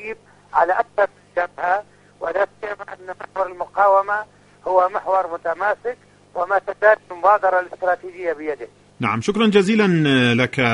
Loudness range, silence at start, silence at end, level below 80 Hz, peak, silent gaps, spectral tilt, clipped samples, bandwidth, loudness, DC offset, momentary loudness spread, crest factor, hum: 4 LU; 0 s; 0 s; -58 dBFS; -2 dBFS; none; -6 dB/octave; under 0.1%; 10.5 kHz; -19 LUFS; under 0.1%; 16 LU; 18 dB; 50 Hz at -55 dBFS